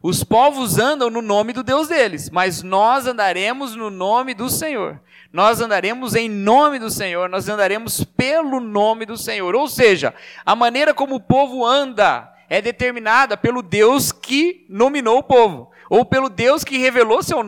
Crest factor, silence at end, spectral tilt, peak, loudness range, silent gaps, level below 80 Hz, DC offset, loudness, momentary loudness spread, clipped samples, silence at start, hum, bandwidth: 16 dB; 0 s; -4 dB/octave; 0 dBFS; 3 LU; none; -50 dBFS; under 0.1%; -17 LUFS; 8 LU; under 0.1%; 0.05 s; none; 18 kHz